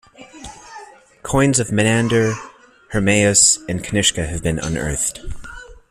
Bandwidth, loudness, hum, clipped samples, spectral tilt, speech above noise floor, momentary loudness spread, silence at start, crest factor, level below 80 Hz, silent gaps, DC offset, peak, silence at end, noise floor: 15 kHz; -17 LUFS; none; under 0.1%; -3.5 dB/octave; 23 dB; 24 LU; 0.2 s; 20 dB; -38 dBFS; none; under 0.1%; 0 dBFS; 0.15 s; -41 dBFS